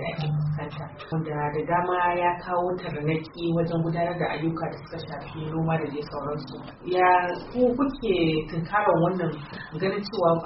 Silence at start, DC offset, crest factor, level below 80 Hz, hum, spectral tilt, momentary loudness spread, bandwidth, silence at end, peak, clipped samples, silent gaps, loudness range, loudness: 0 s; under 0.1%; 18 dB; -50 dBFS; none; -5.5 dB/octave; 12 LU; 5.8 kHz; 0 s; -8 dBFS; under 0.1%; none; 4 LU; -26 LUFS